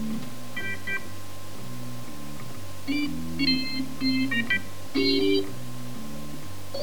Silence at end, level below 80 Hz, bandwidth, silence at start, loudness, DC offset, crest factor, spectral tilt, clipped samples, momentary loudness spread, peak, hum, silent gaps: 0 s; -56 dBFS; over 20 kHz; 0 s; -28 LUFS; 3%; 18 dB; -4.5 dB/octave; under 0.1%; 16 LU; -10 dBFS; none; none